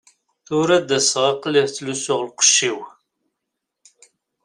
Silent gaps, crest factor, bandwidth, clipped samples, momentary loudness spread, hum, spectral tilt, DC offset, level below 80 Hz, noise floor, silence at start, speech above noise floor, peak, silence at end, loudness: none; 20 dB; 15 kHz; under 0.1%; 11 LU; none; -2 dB/octave; under 0.1%; -66 dBFS; -80 dBFS; 0.5 s; 61 dB; -2 dBFS; 1.55 s; -18 LUFS